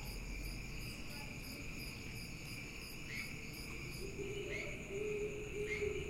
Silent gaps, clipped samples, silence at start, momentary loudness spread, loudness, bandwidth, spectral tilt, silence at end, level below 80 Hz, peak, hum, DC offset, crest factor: none; under 0.1%; 0 s; 6 LU; -45 LUFS; 16 kHz; -4.5 dB/octave; 0 s; -52 dBFS; -28 dBFS; none; under 0.1%; 16 dB